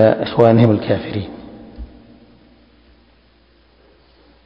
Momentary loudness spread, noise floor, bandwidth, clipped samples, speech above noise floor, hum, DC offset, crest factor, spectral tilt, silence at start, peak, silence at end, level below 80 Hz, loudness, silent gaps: 27 LU; -53 dBFS; 5.4 kHz; 0.1%; 39 dB; none; under 0.1%; 18 dB; -10 dB/octave; 0 s; 0 dBFS; 2.6 s; -44 dBFS; -15 LUFS; none